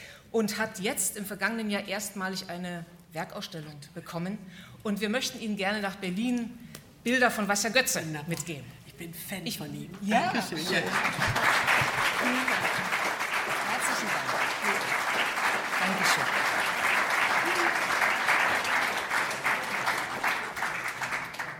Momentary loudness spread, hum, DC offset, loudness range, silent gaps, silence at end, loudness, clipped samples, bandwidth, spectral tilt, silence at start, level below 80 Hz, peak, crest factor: 14 LU; none; under 0.1%; 8 LU; none; 0 s; -28 LUFS; under 0.1%; 18 kHz; -2.5 dB/octave; 0 s; -62 dBFS; -8 dBFS; 20 dB